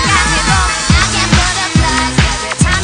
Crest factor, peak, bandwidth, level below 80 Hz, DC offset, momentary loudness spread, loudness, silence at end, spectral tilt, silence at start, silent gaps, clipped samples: 12 dB; 0 dBFS; 10.5 kHz; -20 dBFS; under 0.1%; 3 LU; -11 LUFS; 0 s; -3 dB/octave; 0 s; none; under 0.1%